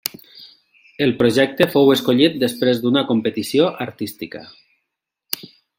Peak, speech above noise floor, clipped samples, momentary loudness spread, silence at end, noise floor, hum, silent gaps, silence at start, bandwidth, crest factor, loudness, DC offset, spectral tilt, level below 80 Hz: 0 dBFS; 61 dB; under 0.1%; 14 LU; 0.35 s; -79 dBFS; none; none; 0.05 s; 17 kHz; 20 dB; -18 LUFS; under 0.1%; -5 dB/octave; -60 dBFS